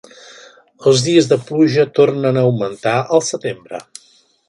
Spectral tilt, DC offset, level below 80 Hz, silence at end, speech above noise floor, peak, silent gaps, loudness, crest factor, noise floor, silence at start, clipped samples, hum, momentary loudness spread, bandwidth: -5.5 dB/octave; under 0.1%; -60 dBFS; 0.7 s; 38 dB; 0 dBFS; none; -15 LUFS; 16 dB; -53 dBFS; 0.8 s; under 0.1%; none; 12 LU; 11.5 kHz